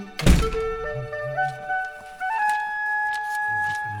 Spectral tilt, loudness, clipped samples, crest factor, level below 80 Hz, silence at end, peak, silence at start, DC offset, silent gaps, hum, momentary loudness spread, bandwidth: -5 dB/octave; -25 LUFS; under 0.1%; 22 dB; -30 dBFS; 0 s; -2 dBFS; 0 s; under 0.1%; none; none; 9 LU; 18.5 kHz